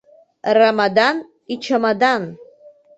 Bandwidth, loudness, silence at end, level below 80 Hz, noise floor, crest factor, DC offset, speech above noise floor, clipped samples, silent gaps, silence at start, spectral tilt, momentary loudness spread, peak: 8.2 kHz; -17 LUFS; 0.55 s; -66 dBFS; -47 dBFS; 16 dB; under 0.1%; 31 dB; under 0.1%; none; 0.45 s; -5 dB/octave; 14 LU; -2 dBFS